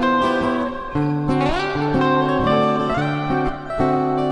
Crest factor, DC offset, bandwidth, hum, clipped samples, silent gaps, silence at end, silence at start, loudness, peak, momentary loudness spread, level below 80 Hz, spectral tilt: 14 dB; under 0.1%; 11 kHz; none; under 0.1%; none; 0 s; 0 s; -20 LUFS; -4 dBFS; 5 LU; -38 dBFS; -7.5 dB/octave